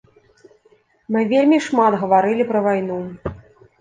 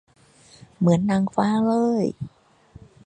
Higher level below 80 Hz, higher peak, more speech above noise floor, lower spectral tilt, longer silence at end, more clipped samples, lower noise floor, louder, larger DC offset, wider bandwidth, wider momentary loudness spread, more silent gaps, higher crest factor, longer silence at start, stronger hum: first, -50 dBFS vs -58 dBFS; about the same, -4 dBFS vs -4 dBFS; first, 40 dB vs 30 dB; second, -6.5 dB/octave vs -8 dB/octave; second, 0.4 s vs 0.8 s; neither; first, -57 dBFS vs -50 dBFS; first, -18 LUFS vs -22 LUFS; neither; about the same, 9.4 kHz vs 9.4 kHz; first, 14 LU vs 11 LU; neither; about the same, 16 dB vs 18 dB; first, 1.1 s vs 0.8 s; neither